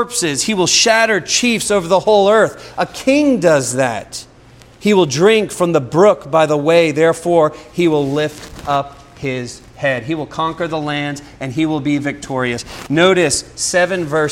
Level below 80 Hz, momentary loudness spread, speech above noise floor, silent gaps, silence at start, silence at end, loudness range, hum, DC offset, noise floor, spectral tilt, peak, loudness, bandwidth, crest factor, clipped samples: -46 dBFS; 11 LU; 28 dB; none; 0 s; 0 s; 7 LU; none; under 0.1%; -43 dBFS; -4 dB/octave; 0 dBFS; -15 LUFS; 16.5 kHz; 16 dB; under 0.1%